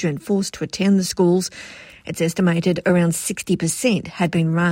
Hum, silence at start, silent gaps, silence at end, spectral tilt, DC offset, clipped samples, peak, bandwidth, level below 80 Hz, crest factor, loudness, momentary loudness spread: none; 0 s; none; 0 s; -5.5 dB/octave; under 0.1%; under 0.1%; -4 dBFS; 16.5 kHz; -54 dBFS; 14 dB; -20 LUFS; 10 LU